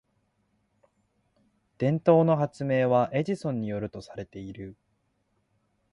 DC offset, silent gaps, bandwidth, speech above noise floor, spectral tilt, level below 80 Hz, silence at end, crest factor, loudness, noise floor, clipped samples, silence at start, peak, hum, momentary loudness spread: under 0.1%; none; 11 kHz; 47 dB; -8.5 dB/octave; -62 dBFS; 1.2 s; 22 dB; -26 LUFS; -73 dBFS; under 0.1%; 1.8 s; -8 dBFS; none; 19 LU